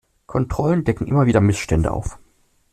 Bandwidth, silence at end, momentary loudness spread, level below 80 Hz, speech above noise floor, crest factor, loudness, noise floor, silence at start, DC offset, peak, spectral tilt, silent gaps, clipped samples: 13.5 kHz; 0.55 s; 11 LU; -34 dBFS; 40 dB; 16 dB; -20 LUFS; -58 dBFS; 0.3 s; under 0.1%; -4 dBFS; -7.5 dB/octave; none; under 0.1%